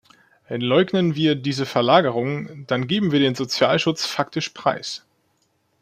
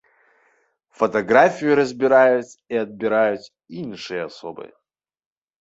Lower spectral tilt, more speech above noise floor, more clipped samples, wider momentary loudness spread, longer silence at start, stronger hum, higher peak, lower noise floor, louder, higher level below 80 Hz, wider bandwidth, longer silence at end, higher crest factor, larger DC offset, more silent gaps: about the same, -5.5 dB/octave vs -5.5 dB/octave; about the same, 46 dB vs 44 dB; neither; second, 11 LU vs 19 LU; second, 0.5 s vs 1 s; neither; about the same, -2 dBFS vs -2 dBFS; about the same, -67 dBFS vs -64 dBFS; about the same, -21 LUFS vs -19 LUFS; about the same, -62 dBFS vs -66 dBFS; first, 15.5 kHz vs 8 kHz; about the same, 0.85 s vs 0.95 s; about the same, 20 dB vs 20 dB; neither; neither